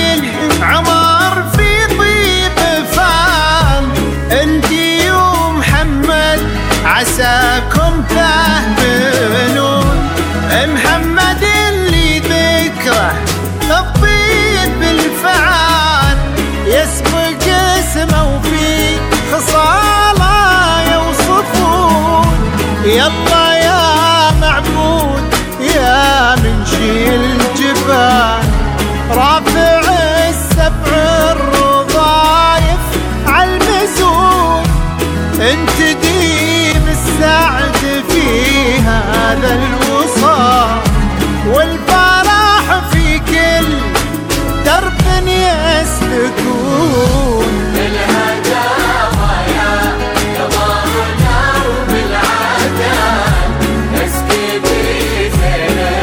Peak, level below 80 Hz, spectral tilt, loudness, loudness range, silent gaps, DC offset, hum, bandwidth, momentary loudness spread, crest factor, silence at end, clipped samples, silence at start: 0 dBFS; -20 dBFS; -4 dB/octave; -11 LUFS; 3 LU; none; under 0.1%; none; 19 kHz; 5 LU; 10 dB; 0 s; under 0.1%; 0 s